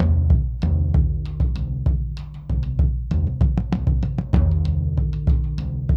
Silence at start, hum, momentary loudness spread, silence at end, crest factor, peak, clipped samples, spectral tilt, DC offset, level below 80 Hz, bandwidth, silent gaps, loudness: 0 s; none; 7 LU; 0 s; 16 dB; -4 dBFS; under 0.1%; -10 dB/octave; 0.2%; -22 dBFS; 5.6 kHz; none; -22 LUFS